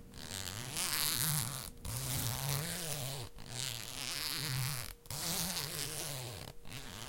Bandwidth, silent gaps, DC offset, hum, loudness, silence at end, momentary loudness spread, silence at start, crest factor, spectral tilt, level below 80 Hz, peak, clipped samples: 17 kHz; none; under 0.1%; none; -37 LUFS; 0 s; 12 LU; 0 s; 26 dB; -2.5 dB/octave; -56 dBFS; -14 dBFS; under 0.1%